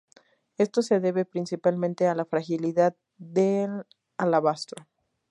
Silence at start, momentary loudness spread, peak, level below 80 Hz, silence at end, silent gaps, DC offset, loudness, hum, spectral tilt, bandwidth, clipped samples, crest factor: 0.6 s; 11 LU; -10 dBFS; -78 dBFS; 0.5 s; none; under 0.1%; -26 LUFS; none; -6.5 dB/octave; 11.5 kHz; under 0.1%; 18 dB